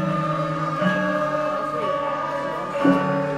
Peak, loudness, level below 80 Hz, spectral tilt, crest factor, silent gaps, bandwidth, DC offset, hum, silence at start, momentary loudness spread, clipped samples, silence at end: -6 dBFS; -23 LUFS; -56 dBFS; -7 dB/octave; 16 dB; none; 12.5 kHz; under 0.1%; none; 0 s; 6 LU; under 0.1%; 0 s